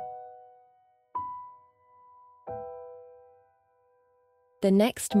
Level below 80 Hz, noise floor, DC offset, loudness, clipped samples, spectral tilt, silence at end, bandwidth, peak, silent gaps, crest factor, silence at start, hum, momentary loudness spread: -70 dBFS; -67 dBFS; under 0.1%; -29 LUFS; under 0.1%; -5.5 dB/octave; 0 s; 16 kHz; -12 dBFS; none; 20 dB; 0 s; none; 26 LU